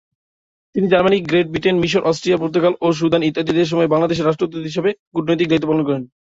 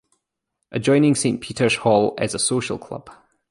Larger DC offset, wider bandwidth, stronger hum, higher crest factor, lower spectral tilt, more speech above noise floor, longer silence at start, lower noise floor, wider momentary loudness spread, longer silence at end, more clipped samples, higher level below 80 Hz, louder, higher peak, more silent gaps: neither; second, 7.8 kHz vs 11.5 kHz; neither; about the same, 14 dB vs 18 dB; first, -6.5 dB/octave vs -4.5 dB/octave; first, over 73 dB vs 59 dB; about the same, 0.75 s vs 0.7 s; first, under -90 dBFS vs -78 dBFS; second, 6 LU vs 14 LU; second, 0.15 s vs 0.4 s; neither; about the same, -52 dBFS vs -56 dBFS; first, -17 LUFS vs -20 LUFS; about the same, -2 dBFS vs -4 dBFS; first, 4.99-5.11 s vs none